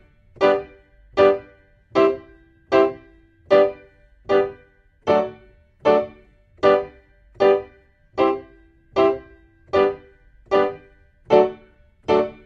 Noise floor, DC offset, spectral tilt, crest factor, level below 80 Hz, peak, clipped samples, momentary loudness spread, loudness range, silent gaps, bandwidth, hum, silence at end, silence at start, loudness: -54 dBFS; under 0.1%; -6.5 dB/octave; 20 dB; -54 dBFS; -2 dBFS; under 0.1%; 13 LU; 2 LU; none; 7.2 kHz; none; 0.15 s; 0.4 s; -20 LUFS